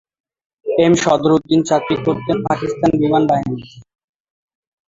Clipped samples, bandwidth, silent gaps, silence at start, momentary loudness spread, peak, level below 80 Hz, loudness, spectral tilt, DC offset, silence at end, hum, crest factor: under 0.1%; 7.8 kHz; none; 0.65 s; 7 LU; -2 dBFS; -50 dBFS; -16 LUFS; -6 dB/octave; under 0.1%; 1.05 s; none; 16 dB